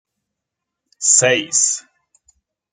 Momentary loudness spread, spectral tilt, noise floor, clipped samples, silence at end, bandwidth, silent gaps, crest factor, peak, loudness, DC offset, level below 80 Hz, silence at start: 8 LU; -1 dB/octave; -81 dBFS; under 0.1%; 0.9 s; 10.5 kHz; none; 20 dB; 0 dBFS; -14 LUFS; under 0.1%; -70 dBFS; 1 s